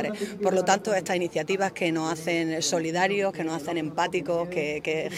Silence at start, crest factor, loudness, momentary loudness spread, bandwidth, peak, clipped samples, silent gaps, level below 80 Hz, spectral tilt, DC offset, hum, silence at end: 0 s; 20 dB; -26 LUFS; 5 LU; 16 kHz; -6 dBFS; under 0.1%; none; -66 dBFS; -4 dB/octave; under 0.1%; none; 0 s